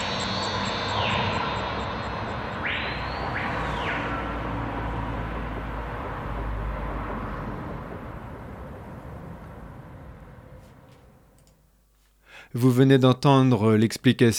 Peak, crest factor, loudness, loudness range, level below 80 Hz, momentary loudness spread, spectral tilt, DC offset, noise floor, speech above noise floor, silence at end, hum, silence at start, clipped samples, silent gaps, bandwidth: -6 dBFS; 20 dB; -25 LUFS; 20 LU; -40 dBFS; 21 LU; -6 dB/octave; under 0.1%; -61 dBFS; 43 dB; 0 s; none; 0 s; under 0.1%; none; 16 kHz